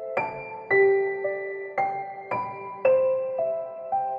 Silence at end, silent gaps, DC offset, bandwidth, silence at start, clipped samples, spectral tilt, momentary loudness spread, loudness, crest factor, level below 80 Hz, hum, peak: 0 s; none; under 0.1%; 5 kHz; 0 s; under 0.1%; -8 dB/octave; 11 LU; -26 LUFS; 16 dB; -70 dBFS; none; -10 dBFS